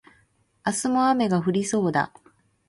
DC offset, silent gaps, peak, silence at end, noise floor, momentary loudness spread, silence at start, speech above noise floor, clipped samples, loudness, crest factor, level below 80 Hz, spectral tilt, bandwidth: under 0.1%; none; -8 dBFS; 0.6 s; -64 dBFS; 8 LU; 0.65 s; 41 dB; under 0.1%; -24 LUFS; 16 dB; -64 dBFS; -5 dB/octave; 11.5 kHz